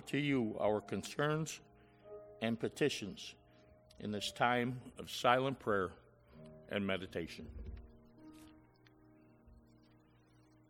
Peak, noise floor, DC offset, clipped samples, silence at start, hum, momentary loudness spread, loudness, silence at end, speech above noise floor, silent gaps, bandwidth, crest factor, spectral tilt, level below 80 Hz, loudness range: -14 dBFS; -67 dBFS; under 0.1%; under 0.1%; 0 s; none; 22 LU; -38 LUFS; 1.15 s; 30 dB; none; 16.5 kHz; 26 dB; -5 dB/octave; -62 dBFS; 10 LU